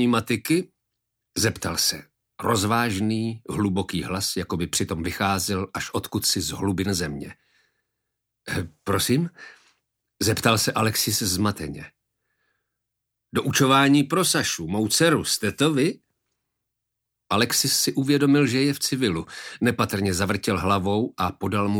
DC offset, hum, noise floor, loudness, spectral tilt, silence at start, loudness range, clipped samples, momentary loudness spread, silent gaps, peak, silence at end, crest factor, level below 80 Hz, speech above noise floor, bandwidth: under 0.1%; none; -82 dBFS; -23 LUFS; -4 dB/octave; 0 s; 6 LU; under 0.1%; 11 LU; none; -4 dBFS; 0 s; 20 dB; -52 dBFS; 59 dB; 18.5 kHz